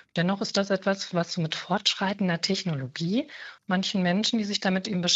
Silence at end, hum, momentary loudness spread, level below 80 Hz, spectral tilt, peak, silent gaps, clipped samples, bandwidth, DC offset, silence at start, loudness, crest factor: 0 s; none; 5 LU; -68 dBFS; -4.5 dB/octave; -6 dBFS; none; under 0.1%; 8 kHz; under 0.1%; 0.15 s; -27 LUFS; 20 dB